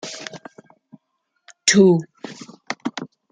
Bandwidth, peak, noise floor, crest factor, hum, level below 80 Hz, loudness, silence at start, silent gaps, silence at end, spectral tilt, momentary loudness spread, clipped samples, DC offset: 9.6 kHz; -2 dBFS; -73 dBFS; 20 dB; none; -66 dBFS; -18 LUFS; 0.05 s; none; 0.25 s; -4 dB/octave; 23 LU; under 0.1%; under 0.1%